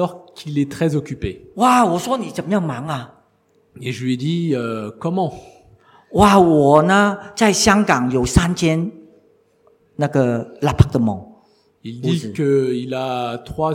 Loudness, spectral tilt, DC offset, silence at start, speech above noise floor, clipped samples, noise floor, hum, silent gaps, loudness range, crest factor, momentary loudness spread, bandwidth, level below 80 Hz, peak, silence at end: -18 LUFS; -5.5 dB/octave; under 0.1%; 0 s; 42 dB; under 0.1%; -59 dBFS; none; none; 9 LU; 18 dB; 15 LU; 16.5 kHz; -38 dBFS; 0 dBFS; 0 s